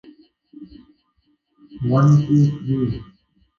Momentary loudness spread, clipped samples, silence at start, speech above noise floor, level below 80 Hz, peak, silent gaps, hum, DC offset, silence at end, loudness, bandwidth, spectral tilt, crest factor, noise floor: 12 LU; under 0.1%; 0.55 s; 49 dB; -50 dBFS; -6 dBFS; none; none; under 0.1%; 0.55 s; -18 LUFS; 7 kHz; -9.5 dB/octave; 16 dB; -66 dBFS